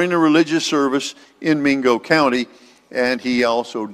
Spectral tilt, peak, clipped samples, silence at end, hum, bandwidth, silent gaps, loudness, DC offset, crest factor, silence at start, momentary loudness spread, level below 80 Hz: -4.5 dB/octave; 0 dBFS; under 0.1%; 0 s; none; 14 kHz; none; -18 LUFS; under 0.1%; 18 dB; 0 s; 10 LU; -60 dBFS